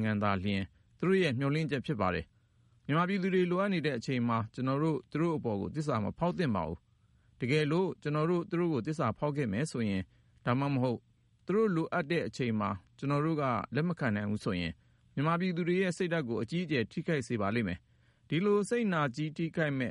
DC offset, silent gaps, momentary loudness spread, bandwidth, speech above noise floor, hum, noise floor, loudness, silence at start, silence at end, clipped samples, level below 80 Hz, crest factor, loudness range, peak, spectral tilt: under 0.1%; none; 7 LU; 11.5 kHz; 35 dB; none; -67 dBFS; -32 LUFS; 0 s; 0 s; under 0.1%; -62 dBFS; 16 dB; 1 LU; -16 dBFS; -7 dB/octave